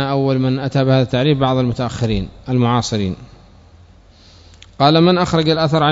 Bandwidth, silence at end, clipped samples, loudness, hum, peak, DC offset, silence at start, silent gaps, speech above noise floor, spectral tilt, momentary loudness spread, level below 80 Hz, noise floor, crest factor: 8 kHz; 0 s; under 0.1%; -16 LUFS; none; 0 dBFS; under 0.1%; 0 s; none; 30 dB; -6.5 dB/octave; 8 LU; -40 dBFS; -45 dBFS; 16 dB